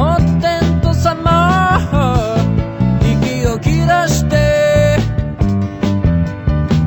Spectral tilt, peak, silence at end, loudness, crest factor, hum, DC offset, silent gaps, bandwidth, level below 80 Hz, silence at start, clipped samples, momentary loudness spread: -6.5 dB/octave; -2 dBFS; 0 s; -14 LUFS; 12 dB; none; under 0.1%; none; 18.5 kHz; -22 dBFS; 0 s; under 0.1%; 5 LU